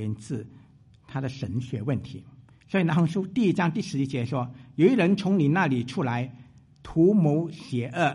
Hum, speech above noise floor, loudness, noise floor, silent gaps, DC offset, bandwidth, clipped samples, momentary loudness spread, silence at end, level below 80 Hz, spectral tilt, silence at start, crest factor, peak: none; 29 dB; -26 LUFS; -53 dBFS; none; under 0.1%; 11 kHz; under 0.1%; 13 LU; 0 s; -58 dBFS; -7.5 dB/octave; 0 s; 18 dB; -8 dBFS